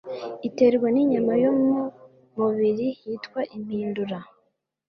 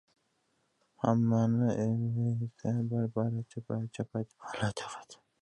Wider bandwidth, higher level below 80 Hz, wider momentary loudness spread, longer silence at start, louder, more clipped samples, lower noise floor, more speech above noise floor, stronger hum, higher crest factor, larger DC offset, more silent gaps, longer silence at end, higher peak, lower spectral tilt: second, 6.4 kHz vs 10.5 kHz; about the same, -66 dBFS vs -64 dBFS; first, 14 LU vs 11 LU; second, 0.05 s vs 1 s; first, -24 LUFS vs -32 LUFS; neither; second, -71 dBFS vs -76 dBFS; first, 48 dB vs 44 dB; neither; about the same, 16 dB vs 20 dB; neither; neither; first, 0.65 s vs 0.3 s; first, -8 dBFS vs -12 dBFS; about the same, -8 dB/octave vs -7.5 dB/octave